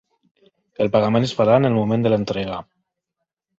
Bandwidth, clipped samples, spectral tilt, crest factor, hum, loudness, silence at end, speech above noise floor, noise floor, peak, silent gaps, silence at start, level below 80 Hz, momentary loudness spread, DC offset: 7.8 kHz; under 0.1%; -7.5 dB/octave; 18 dB; none; -19 LUFS; 1 s; 63 dB; -81 dBFS; -4 dBFS; none; 0.8 s; -54 dBFS; 10 LU; under 0.1%